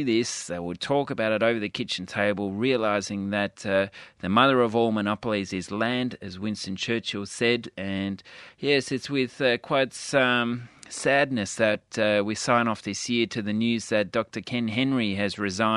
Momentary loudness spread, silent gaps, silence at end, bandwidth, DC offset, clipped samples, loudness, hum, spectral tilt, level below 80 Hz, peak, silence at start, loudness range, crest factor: 9 LU; none; 0 s; 11.5 kHz; under 0.1%; under 0.1%; -26 LUFS; none; -4.5 dB/octave; -64 dBFS; -4 dBFS; 0 s; 3 LU; 22 dB